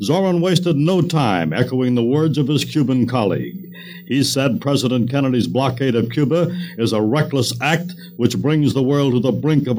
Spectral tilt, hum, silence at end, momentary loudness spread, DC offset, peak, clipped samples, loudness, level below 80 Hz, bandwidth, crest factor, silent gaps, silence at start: -6 dB/octave; none; 0 s; 5 LU; under 0.1%; 0 dBFS; under 0.1%; -18 LUFS; -56 dBFS; 17 kHz; 18 dB; none; 0 s